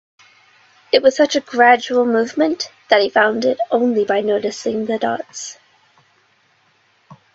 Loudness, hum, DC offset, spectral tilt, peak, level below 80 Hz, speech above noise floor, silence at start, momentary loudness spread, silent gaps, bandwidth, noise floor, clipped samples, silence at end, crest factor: -16 LUFS; none; under 0.1%; -3.5 dB/octave; 0 dBFS; -66 dBFS; 42 dB; 0.95 s; 10 LU; none; 8 kHz; -58 dBFS; under 0.1%; 0.2 s; 18 dB